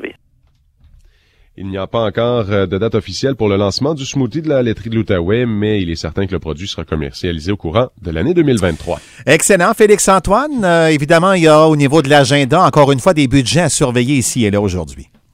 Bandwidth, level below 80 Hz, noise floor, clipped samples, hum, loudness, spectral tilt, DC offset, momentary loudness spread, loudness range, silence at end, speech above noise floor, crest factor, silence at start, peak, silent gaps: 16.5 kHz; -36 dBFS; -54 dBFS; 0.1%; none; -13 LUFS; -5 dB/octave; under 0.1%; 11 LU; 8 LU; 0.3 s; 41 dB; 14 dB; 0 s; 0 dBFS; none